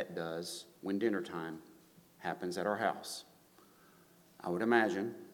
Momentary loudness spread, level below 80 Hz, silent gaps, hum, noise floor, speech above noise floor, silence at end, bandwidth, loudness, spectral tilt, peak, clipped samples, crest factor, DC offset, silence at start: 15 LU; -82 dBFS; none; none; -64 dBFS; 28 dB; 0 s; 19 kHz; -37 LUFS; -5 dB/octave; -12 dBFS; under 0.1%; 24 dB; under 0.1%; 0 s